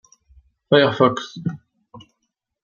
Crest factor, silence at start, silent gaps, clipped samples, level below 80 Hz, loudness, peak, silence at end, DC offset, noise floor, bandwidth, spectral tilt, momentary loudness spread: 20 dB; 0.7 s; none; under 0.1%; -60 dBFS; -19 LUFS; -2 dBFS; 0.65 s; under 0.1%; -76 dBFS; 7.2 kHz; -6 dB/octave; 14 LU